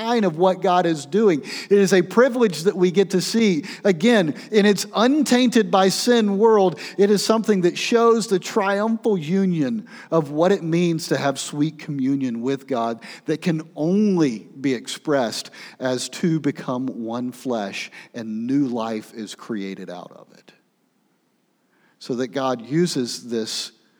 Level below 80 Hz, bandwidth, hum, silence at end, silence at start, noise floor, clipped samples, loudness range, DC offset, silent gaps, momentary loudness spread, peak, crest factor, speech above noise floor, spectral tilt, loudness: -80 dBFS; over 20 kHz; none; 0.3 s; 0 s; -66 dBFS; under 0.1%; 11 LU; under 0.1%; none; 12 LU; -2 dBFS; 18 dB; 46 dB; -5 dB/octave; -21 LUFS